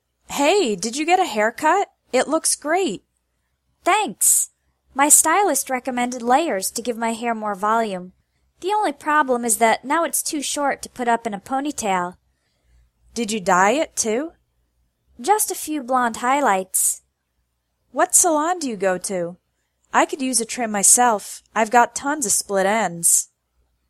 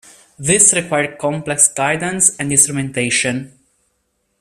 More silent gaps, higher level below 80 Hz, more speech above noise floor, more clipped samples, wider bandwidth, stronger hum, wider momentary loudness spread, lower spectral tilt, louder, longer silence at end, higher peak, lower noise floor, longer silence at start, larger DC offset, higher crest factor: neither; second, -62 dBFS vs -54 dBFS; about the same, 52 dB vs 51 dB; neither; second, 16 kHz vs over 20 kHz; neither; about the same, 12 LU vs 10 LU; about the same, -2 dB/octave vs -2.5 dB/octave; second, -19 LUFS vs -14 LUFS; second, 0.65 s vs 0.95 s; about the same, 0 dBFS vs 0 dBFS; first, -72 dBFS vs -67 dBFS; about the same, 0.3 s vs 0.4 s; neither; about the same, 20 dB vs 18 dB